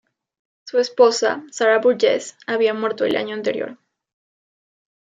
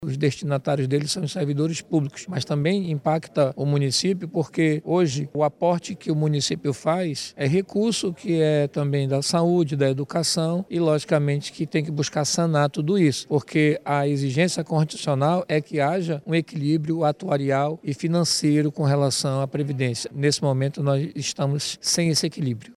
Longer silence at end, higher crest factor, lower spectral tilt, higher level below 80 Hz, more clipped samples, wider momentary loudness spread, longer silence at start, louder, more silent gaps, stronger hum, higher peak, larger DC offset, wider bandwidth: first, 1.4 s vs 0.05 s; about the same, 18 dB vs 16 dB; second, -3 dB/octave vs -5.5 dB/octave; second, -72 dBFS vs -64 dBFS; neither; first, 9 LU vs 5 LU; first, 0.65 s vs 0 s; first, -19 LUFS vs -23 LUFS; neither; neither; first, -2 dBFS vs -6 dBFS; neither; second, 9.4 kHz vs 13.5 kHz